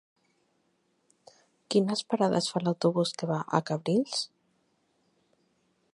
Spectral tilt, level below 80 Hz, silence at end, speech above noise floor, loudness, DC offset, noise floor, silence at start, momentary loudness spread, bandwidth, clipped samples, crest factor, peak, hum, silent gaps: -5.5 dB/octave; -78 dBFS; 1.65 s; 45 dB; -28 LUFS; under 0.1%; -73 dBFS; 1.7 s; 5 LU; 11.5 kHz; under 0.1%; 24 dB; -8 dBFS; none; none